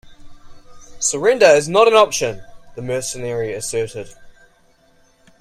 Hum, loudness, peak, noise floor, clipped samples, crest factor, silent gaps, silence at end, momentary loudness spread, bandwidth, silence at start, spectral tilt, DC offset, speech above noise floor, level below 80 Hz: none; -16 LUFS; 0 dBFS; -55 dBFS; under 0.1%; 18 dB; none; 1.1 s; 21 LU; 15.5 kHz; 0.05 s; -3 dB/octave; under 0.1%; 38 dB; -48 dBFS